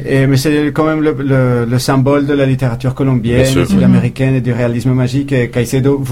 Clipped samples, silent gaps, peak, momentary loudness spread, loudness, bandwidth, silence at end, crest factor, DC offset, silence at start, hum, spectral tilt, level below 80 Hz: under 0.1%; none; 0 dBFS; 4 LU; -12 LUFS; 15.5 kHz; 0 s; 12 dB; under 0.1%; 0 s; none; -7 dB/octave; -34 dBFS